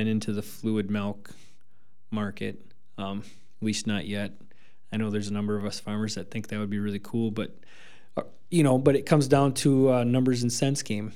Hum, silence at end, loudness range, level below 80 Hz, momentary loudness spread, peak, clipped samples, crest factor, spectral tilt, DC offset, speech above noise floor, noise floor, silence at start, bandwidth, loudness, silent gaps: none; 0 s; 10 LU; -66 dBFS; 15 LU; -6 dBFS; under 0.1%; 22 dB; -6 dB/octave; 1%; 43 dB; -70 dBFS; 0 s; 16 kHz; -27 LUFS; none